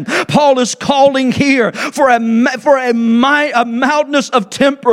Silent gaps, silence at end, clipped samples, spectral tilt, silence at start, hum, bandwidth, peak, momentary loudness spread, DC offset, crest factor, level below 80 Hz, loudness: none; 0 s; under 0.1%; -4.5 dB/octave; 0 s; none; 14 kHz; 0 dBFS; 3 LU; under 0.1%; 12 dB; -54 dBFS; -12 LUFS